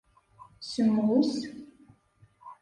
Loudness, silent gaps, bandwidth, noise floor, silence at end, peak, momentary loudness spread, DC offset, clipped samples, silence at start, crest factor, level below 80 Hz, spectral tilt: -27 LUFS; none; 10.5 kHz; -62 dBFS; 0.1 s; -14 dBFS; 19 LU; under 0.1%; under 0.1%; 0.6 s; 16 dB; -68 dBFS; -6 dB/octave